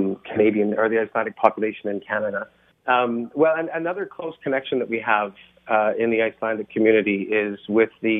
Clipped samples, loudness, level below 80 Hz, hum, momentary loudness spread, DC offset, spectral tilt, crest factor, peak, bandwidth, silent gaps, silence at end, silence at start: under 0.1%; -22 LUFS; -68 dBFS; none; 9 LU; under 0.1%; -9 dB/octave; 22 dB; 0 dBFS; 3.9 kHz; none; 0 s; 0 s